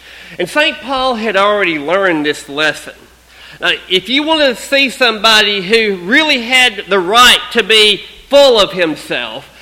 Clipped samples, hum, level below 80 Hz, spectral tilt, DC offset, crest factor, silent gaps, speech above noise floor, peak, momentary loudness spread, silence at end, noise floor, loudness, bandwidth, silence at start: 0.4%; none; -44 dBFS; -2 dB/octave; under 0.1%; 12 dB; none; 26 dB; 0 dBFS; 10 LU; 0.15 s; -38 dBFS; -10 LUFS; over 20 kHz; 0.05 s